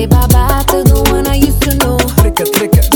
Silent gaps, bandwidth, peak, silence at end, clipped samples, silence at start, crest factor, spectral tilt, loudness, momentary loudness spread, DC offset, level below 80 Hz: none; over 20 kHz; 0 dBFS; 0 s; 2%; 0 s; 10 dB; -5 dB/octave; -10 LUFS; 2 LU; under 0.1%; -14 dBFS